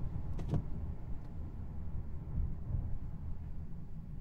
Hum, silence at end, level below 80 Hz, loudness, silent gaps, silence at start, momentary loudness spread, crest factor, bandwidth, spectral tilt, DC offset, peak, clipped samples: none; 0 s; -42 dBFS; -43 LUFS; none; 0 s; 8 LU; 16 dB; 3.9 kHz; -10 dB/octave; under 0.1%; -22 dBFS; under 0.1%